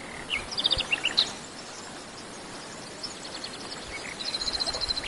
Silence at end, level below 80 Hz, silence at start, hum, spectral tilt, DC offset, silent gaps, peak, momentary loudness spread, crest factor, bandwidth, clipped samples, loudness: 0 s; -52 dBFS; 0 s; none; -1 dB/octave; under 0.1%; none; -8 dBFS; 15 LU; 26 dB; 11.5 kHz; under 0.1%; -29 LUFS